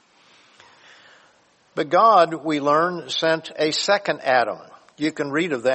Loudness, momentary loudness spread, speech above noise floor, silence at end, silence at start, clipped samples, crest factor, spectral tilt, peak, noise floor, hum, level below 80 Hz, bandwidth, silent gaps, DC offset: -20 LUFS; 12 LU; 38 dB; 0 s; 1.75 s; under 0.1%; 18 dB; -4 dB/octave; -4 dBFS; -58 dBFS; none; -72 dBFS; 8.6 kHz; none; under 0.1%